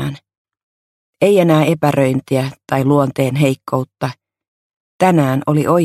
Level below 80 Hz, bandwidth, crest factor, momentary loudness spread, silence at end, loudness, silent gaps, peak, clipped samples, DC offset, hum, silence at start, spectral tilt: -54 dBFS; 15 kHz; 16 dB; 9 LU; 0 s; -15 LUFS; 0.37-0.45 s, 0.63-1.13 s, 4.48-4.70 s, 4.76-4.99 s; 0 dBFS; under 0.1%; under 0.1%; none; 0 s; -7 dB/octave